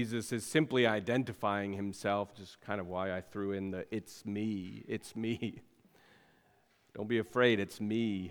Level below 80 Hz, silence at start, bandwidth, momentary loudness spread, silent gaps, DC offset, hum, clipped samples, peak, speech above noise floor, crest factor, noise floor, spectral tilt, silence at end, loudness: -72 dBFS; 0 s; 19 kHz; 12 LU; none; under 0.1%; none; under 0.1%; -14 dBFS; 35 dB; 22 dB; -70 dBFS; -5.5 dB/octave; 0 s; -35 LUFS